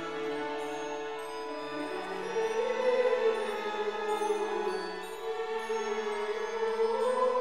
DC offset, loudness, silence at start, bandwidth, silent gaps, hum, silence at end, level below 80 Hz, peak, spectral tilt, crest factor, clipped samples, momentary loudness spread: 0.3%; -32 LUFS; 0 s; 14.5 kHz; none; none; 0 s; -72 dBFS; -18 dBFS; -3 dB/octave; 16 dB; under 0.1%; 9 LU